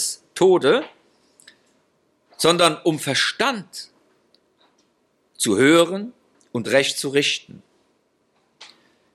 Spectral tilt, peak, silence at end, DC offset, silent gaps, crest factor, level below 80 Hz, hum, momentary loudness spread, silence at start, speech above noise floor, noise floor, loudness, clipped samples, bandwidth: -3.5 dB/octave; -2 dBFS; 0.5 s; under 0.1%; none; 22 dB; -70 dBFS; none; 17 LU; 0 s; 47 dB; -66 dBFS; -19 LUFS; under 0.1%; 15 kHz